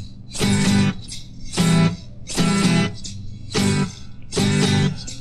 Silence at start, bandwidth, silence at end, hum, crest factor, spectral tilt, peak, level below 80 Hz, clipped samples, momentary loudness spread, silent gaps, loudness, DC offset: 0 s; 14 kHz; 0 s; none; 14 dB; -5 dB/octave; -6 dBFS; -38 dBFS; under 0.1%; 16 LU; none; -20 LUFS; under 0.1%